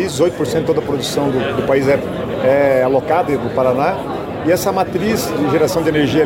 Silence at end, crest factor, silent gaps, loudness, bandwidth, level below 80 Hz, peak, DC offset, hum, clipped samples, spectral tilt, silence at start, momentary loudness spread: 0 s; 12 dB; none; -16 LUFS; 16.5 kHz; -42 dBFS; -4 dBFS; under 0.1%; none; under 0.1%; -5.5 dB/octave; 0 s; 5 LU